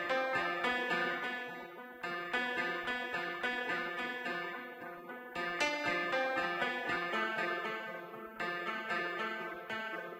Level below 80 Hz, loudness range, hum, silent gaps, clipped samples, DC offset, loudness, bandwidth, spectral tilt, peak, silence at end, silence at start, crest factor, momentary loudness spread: -74 dBFS; 2 LU; none; none; under 0.1%; under 0.1%; -36 LUFS; 16 kHz; -3.5 dB/octave; -18 dBFS; 0 s; 0 s; 18 dB; 11 LU